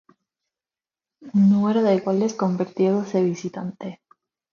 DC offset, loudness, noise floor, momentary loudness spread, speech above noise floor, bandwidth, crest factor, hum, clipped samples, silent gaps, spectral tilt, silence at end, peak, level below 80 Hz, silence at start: under 0.1%; -21 LUFS; under -90 dBFS; 14 LU; over 69 dB; 7 kHz; 16 dB; none; under 0.1%; none; -8 dB/octave; 0.6 s; -8 dBFS; -68 dBFS; 1.2 s